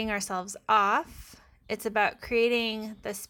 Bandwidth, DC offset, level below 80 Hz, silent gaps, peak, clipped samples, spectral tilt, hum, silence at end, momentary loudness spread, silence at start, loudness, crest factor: 18.5 kHz; under 0.1%; -56 dBFS; none; -10 dBFS; under 0.1%; -3 dB/octave; none; 0.05 s; 13 LU; 0 s; -28 LUFS; 18 dB